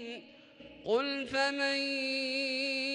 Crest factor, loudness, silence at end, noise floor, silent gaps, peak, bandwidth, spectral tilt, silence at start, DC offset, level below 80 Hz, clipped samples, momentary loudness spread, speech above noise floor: 16 dB; -31 LUFS; 0 s; -54 dBFS; none; -18 dBFS; 11.5 kHz; -2.5 dB/octave; 0 s; under 0.1%; -74 dBFS; under 0.1%; 12 LU; 22 dB